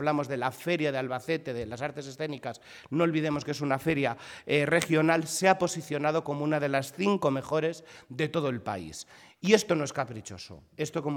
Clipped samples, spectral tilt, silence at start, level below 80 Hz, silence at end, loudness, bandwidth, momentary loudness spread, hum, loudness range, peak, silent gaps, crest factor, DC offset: under 0.1%; -5 dB/octave; 0 s; -64 dBFS; 0 s; -29 LUFS; 18.5 kHz; 15 LU; none; 4 LU; -8 dBFS; none; 20 dB; under 0.1%